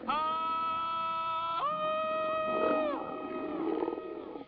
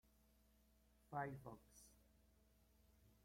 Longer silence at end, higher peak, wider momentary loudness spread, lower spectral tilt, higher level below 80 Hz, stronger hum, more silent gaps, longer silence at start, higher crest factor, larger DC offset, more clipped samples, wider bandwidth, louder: about the same, 0 s vs 0.1 s; first, -18 dBFS vs -34 dBFS; second, 7 LU vs 18 LU; second, -2.5 dB/octave vs -6 dB/octave; first, -68 dBFS vs -76 dBFS; neither; neither; second, 0 s vs 0.3 s; second, 16 dB vs 24 dB; neither; neither; second, 5.4 kHz vs 16 kHz; first, -33 LUFS vs -52 LUFS